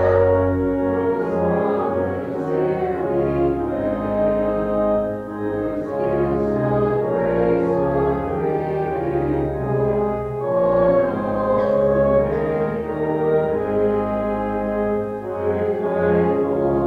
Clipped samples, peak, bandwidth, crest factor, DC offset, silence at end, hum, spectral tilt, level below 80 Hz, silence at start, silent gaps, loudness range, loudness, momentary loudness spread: under 0.1%; -4 dBFS; 5.2 kHz; 16 dB; under 0.1%; 0 s; none; -10 dB/octave; -40 dBFS; 0 s; none; 2 LU; -20 LUFS; 6 LU